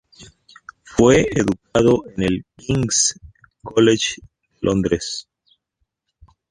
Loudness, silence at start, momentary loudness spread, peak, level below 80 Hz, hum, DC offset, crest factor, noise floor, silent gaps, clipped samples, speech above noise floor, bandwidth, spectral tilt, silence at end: -18 LUFS; 0.2 s; 12 LU; -2 dBFS; -44 dBFS; none; under 0.1%; 18 dB; -74 dBFS; none; under 0.1%; 56 dB; 11.5 kHz; -4.5 dB/octave; 1.3 s